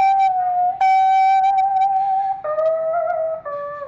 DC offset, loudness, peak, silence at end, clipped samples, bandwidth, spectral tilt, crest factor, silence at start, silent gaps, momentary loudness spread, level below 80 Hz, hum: under 0.1%; -18 LUFS; -12 dBFS; 0 s; under 0.1%; 7.4 kHz; -3 dB/octave; 6 dB; 0 s; none; 8 LU; -62 dBFS; none